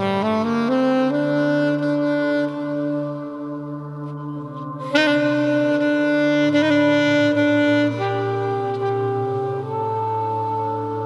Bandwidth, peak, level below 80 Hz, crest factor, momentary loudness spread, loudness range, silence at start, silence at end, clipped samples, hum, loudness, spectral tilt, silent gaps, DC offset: 10 kHz; -2 dBFS; -66 dBFS; 18 dB; 13 LU; 6 LU; 0 s; 0 s; under 0.1%; none; -20 LUFS; -6.5 dB/octave; none; under 0.1%